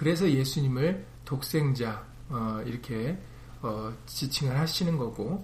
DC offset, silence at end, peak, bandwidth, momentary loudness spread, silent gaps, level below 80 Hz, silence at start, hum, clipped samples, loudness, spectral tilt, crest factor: under 0.1%; 0 s; -14 dBFS; 15.5 kHz; 11 LU; none; -50 dBFS; 0 s; none; under 0.1%; -30 LUFS; -6 dB/octave; 16 dB